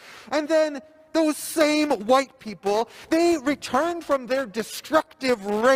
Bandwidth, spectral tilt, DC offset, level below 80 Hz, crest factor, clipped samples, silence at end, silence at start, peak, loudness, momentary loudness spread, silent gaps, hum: 16 kHz; -3.5 dB/octave; under 0.1%; -62 dBFS; 18 dB; under 0.1%; 0 s; 0.05 s; -6 dBFS; -24 LUFS; 8 LU; none; none